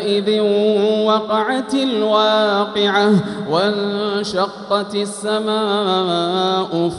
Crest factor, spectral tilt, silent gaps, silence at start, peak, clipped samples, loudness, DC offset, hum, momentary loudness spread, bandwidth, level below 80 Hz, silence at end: 14 dB; -5 dB/octave; none; 0 s; -4 dBFS; under 0.1%; -17 LUFS; under 0.1%; none; 6 LU; 11.5 kHz; -60 dBFS; 0 s